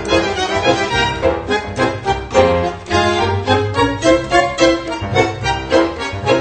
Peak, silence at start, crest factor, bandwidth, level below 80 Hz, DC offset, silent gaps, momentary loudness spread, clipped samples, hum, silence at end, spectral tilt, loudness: 0 dBFS; 0 s; 16 dB; 9 kHz; -34 dBFS; under 0.1%; none; 6 LU; under 0.1%; none; 0 s; -5 dB/octave; -16 LUFS